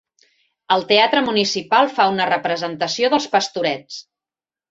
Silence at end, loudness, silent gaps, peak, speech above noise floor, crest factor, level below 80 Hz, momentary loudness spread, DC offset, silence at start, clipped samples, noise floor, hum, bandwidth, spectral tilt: 0.7 s; -18 LUFS; none; 0 dBFS; over 72 dB; 18 dB; -64 dBFS; 9 LU; under 0.1%; 0.7 s; under 0.1%; under -90 dBFS; none; 8 kHz; -3 dB/octave